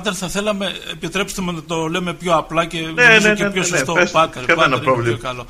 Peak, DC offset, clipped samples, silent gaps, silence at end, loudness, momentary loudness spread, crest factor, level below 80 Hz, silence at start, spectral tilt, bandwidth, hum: 0 dBFS; under 0.1%; under 0.1%; none; 0 s; -16 LUFS; 12 LU; 18 dB; -42 dBFS; 0 s; -3.5 dB/octave; 15.5 kHz; none